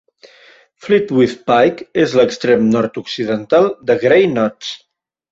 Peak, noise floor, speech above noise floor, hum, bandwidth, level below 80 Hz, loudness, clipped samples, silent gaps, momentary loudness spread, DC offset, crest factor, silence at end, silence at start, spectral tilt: -2 dBFS; -47 dBFS; 33 dB; none; 7.8 kHz; -54 dBFS; -14 LUFS; under 0.1%; none; 10 LU; under 0.1%; 14 dB; 0.55 s; 0.85 s; -6 dB/octave